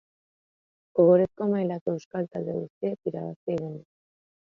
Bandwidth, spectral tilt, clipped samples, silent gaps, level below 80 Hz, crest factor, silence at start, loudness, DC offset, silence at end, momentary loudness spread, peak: 6.8 kHz; -9.5 dB/octave; under 0.1%; 1.81-1.86 s, 2.05-2.11 s, 2.70-2.81 s, 3.36-3.47 s; -68 dBFS; 20 dB; 0.95 s; -27 LUFS; under 0.1%; 0.7 s; 14 LU; -8 dBFS